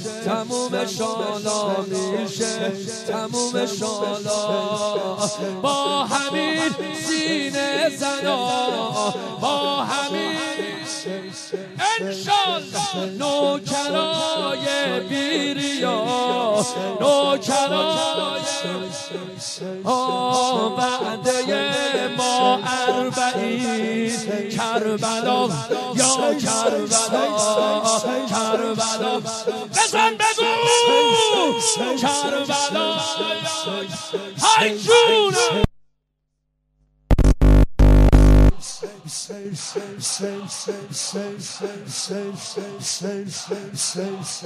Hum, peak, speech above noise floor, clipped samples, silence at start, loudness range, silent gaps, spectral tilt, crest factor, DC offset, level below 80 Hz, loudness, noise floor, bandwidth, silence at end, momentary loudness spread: none; -2 dBFS; 52 dB; under 0.1%; 0 s; 6 LU; none; -3.5 dB/octave; 20 dB; under 0.1%; -28 dBFS; -21 LUFS; -73 dBFS; 14 kHz; 0 s; 12 LU